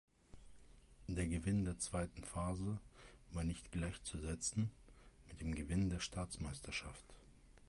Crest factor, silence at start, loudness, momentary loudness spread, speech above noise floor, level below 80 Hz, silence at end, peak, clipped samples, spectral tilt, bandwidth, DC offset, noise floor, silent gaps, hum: 16 dB; 0.35 s; -43 LUFS; 16 LU; 21 dB; -52 dBFS; 0.05 s; -28 dBFS; under 0.1%; -5 dB/octave; 11.5 kHz; under 0.1%; -63 dBFS; none; none